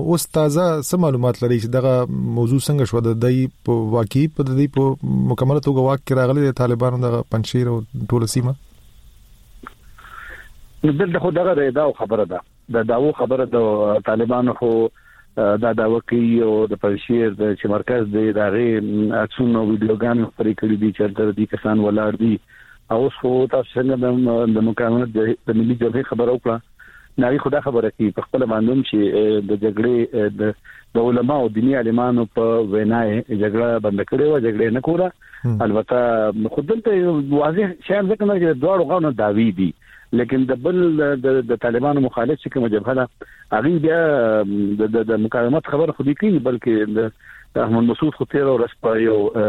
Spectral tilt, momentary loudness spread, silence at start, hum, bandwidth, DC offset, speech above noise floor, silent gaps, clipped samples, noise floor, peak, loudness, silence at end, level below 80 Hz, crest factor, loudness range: -7.5 dB/octave; 4 LU; 0 s; none; 15 kHz; under 0.1%; 28 dB; none; under 0.1%; -46 dBFS; -4 dBFS; -19 LUFS; 0 s; -50 dBFS; 14 dB; 2 LU